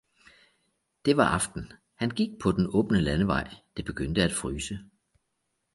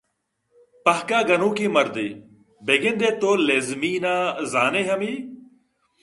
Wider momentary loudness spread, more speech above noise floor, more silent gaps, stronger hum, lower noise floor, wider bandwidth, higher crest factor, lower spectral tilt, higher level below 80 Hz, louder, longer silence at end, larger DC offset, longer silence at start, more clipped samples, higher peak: first, 14 LU vs 10 LU; about the same, 52 dB vs 53 dB; neither; neither; first, -79 dBFS vs -75 dBFS; about the same, 11.5 kHz vs 11.5 kHz; about the same, 22 dB vs 20 dB; about the same, -5 dB/octave vs -4 dB/octave; first, -46 dBFS vs -70 dBFS; second, -27 LUFS vs -21 LUFS; first, 0.9 s vs 0.6 s; neither; first, 1.05 s vs 0.85 s; neither; second, -8 dBFS vs -2 dBFS